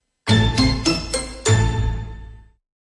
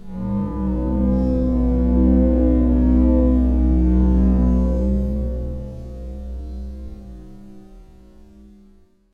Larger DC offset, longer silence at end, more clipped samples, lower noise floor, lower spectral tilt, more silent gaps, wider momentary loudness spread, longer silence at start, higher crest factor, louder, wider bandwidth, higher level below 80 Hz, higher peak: neither; second, 0.55 s vs 1.3 s; neither; second, -39 dBFS vs -51 dBFS; second, -4.5 dB/octave vs -11.5 dB/octave; neither; second, 13 LU vs 17 LU; first, 0.25 s vs 0 s; about the same, 18 dB vs 14 dB; about the same, -19 LUFS vs -19 LUFS; first, 11.5 kHz vs 2.6 kHz; second, -28 dBFS vs -22 dBFS; first, -2 dBFS vs -6 dBFS